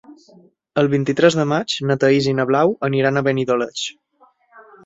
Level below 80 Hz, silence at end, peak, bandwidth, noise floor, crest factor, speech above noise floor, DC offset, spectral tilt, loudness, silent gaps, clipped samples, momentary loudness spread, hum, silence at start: -58 dBFS; 0.25 s; -2 dBFS; 8 kHz; -56 dBFS; 18 dB; 38 dB; under 0.1%; -5.5 dB/octave; -18 LUFS; none; under 0.1%; 8 LU; none; 0.1 s